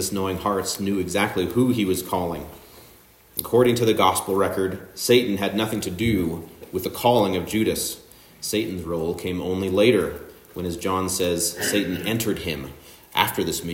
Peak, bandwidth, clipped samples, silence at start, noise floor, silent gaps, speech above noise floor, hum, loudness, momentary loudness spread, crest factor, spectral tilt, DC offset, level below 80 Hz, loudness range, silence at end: 0 dBFS; 16.5 kHz; under 0.1%; 0 s; -51 dBFS; none; 29 dB; none; -23 LUFS; 12 LU; 22 dB; -4.5 dB/octave; under 0.1%; -52 dBFS; 3 LU; 0 s